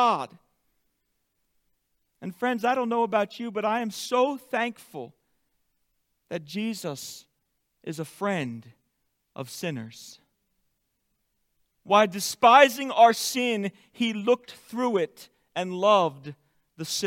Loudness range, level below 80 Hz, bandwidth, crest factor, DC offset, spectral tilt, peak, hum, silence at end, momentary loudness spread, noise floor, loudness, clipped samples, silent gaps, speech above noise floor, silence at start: 14 LU; -78 dBFS; 17 kHz; 24 dB; under 0.1%; -3.5 dB/octave; -4 dBFS; none; 0 s; 21 LU; -76 dBFS; -25 LUFS; under 0.1%; none; 51 dB; 0 s